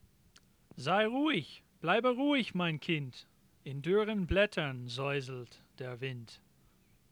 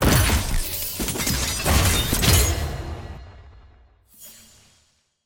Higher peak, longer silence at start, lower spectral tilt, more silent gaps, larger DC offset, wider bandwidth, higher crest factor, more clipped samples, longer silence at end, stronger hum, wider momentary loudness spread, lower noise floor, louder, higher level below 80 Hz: second, -14 dBFS vs -4 dBFS; first, 0.75 s vs 0 s; first, -6 dB/octave vs -3.5 dB/octave; neither; neither; first, 19 kHz vs 17 kHz; about the same, 20 dB vs 18 dB; neither; second, 0.75 s vs 0.95 s; neither; second, 17 LU vs 23 LU; about the same, -67 dBFS vs -64 dBFS; second, -33 LUFS vs -21 LUFS; second, -54 dBFS vs -28 dBFS